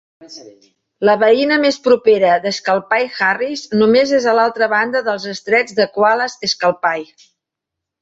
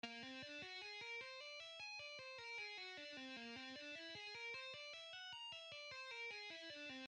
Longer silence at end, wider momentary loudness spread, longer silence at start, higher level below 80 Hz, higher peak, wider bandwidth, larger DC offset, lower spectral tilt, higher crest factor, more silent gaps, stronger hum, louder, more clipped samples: first, 1 s vs 0 s; first, 7 LU vs 3 LU; first, 0.2 s vs 0.05 s; first, -62 dBFS vs under -90 dBFS; first, -2 dBFS vs -36 dBFS; second, 7.8 kHz vs 10 kHz; neither; first, -4 dB/octave vs -2 dB/octave; about the same, 14 dB vs 16 dB; neither; neither; first, -15 LUFS vs -51 LUFS; neither